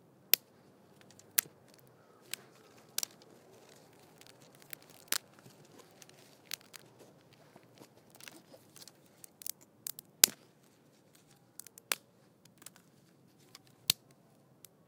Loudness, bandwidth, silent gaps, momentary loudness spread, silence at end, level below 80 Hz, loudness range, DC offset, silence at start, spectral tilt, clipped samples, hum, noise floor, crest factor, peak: -34 LUFS; 18 kHz; none; 28 LU; 0.95 s; under -90 dBFS; 17 LU; under 0.1%; 0.35 s; 0.5 dB/octave; under 0.1%; none; -65 dBFS; 42 dB; 0 dBFS